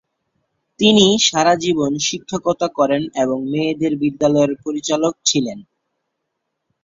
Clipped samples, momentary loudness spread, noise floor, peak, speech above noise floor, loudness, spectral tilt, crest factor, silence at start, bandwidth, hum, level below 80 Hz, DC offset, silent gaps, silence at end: under 0.1%; 9 LU; -76 dBFS; 0 dBFS; 59 dB; -17 LUFS; -3.5 dB/octave; 18 dB; 0.8 s; 7.8 kHz; none; -56 dBFS; under 0.1%; none; 1.2 s